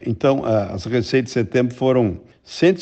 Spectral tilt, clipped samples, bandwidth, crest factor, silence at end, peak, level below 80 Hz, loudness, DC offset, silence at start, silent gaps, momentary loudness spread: -7 dB/octave; under 0.1%; 8.4 kHz; 16 dB; 0 s; -4 dBFS; -50 dBFS; -19 LUFS; under 0.1%; 0 s; none; 5 LU